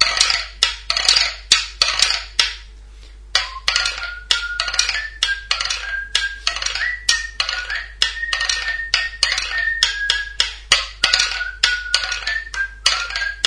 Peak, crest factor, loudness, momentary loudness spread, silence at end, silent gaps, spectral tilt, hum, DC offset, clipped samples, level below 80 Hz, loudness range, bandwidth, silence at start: 0 dBFS; 20 dB; -18 LUFS; 7 LU; 0 s; none; 2 dB/octave; none; under 0.1%; under 0.1%; -38 dBFS; 3 LU; 11 kHz; 0 s